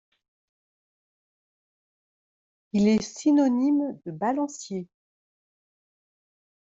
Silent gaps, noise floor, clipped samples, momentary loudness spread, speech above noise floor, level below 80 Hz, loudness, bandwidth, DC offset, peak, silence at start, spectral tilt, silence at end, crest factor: none; under -90 dBFS; under 0.1%; 13 LU; over 66 dB; -68 dBFS; -25 LUFS; 8 kHz; under 0.1%; -12 dBFS; 2.75 s; -6 dB/octave; 1.75 s; 18 dB